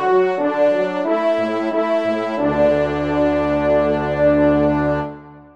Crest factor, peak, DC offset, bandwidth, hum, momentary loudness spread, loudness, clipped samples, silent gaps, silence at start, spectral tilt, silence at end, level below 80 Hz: 12 dB; -6 dBFS; 0.3%; 8 kHz; none; 5 LU; -18 LUFS; under 0.1%; none; 0 s; -8 dB/octave; 0.15 s; -40 dBFS